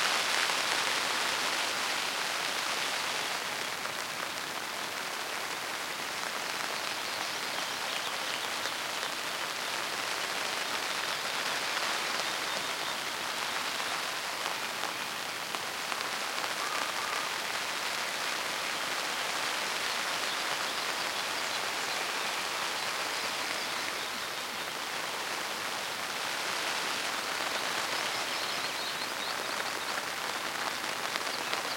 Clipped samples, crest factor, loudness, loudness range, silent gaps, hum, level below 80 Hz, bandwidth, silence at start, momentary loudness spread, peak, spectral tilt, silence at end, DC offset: under 0.1%; 26 dB; -32 LUFS; 2 LU; none; none; -74 dBFS; 17 kHz; 0 s; 4 LU; -8 dBFS; 0 dB/octave; 0 s; under 0.1%